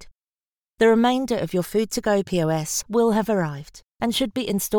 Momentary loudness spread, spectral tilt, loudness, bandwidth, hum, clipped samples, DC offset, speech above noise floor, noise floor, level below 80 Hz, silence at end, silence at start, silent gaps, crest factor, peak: 6 LU; -4.5 dB/octave; -22 LUFS; over 20 kHz; none; under 0.1%; under 0.1%; over 68 dB; under -90 dBFS; -52 dBFS; 0 s; 0 s; 0.24-0.33 s, 0.47-0.52 s; 16 dB; -6 dBFS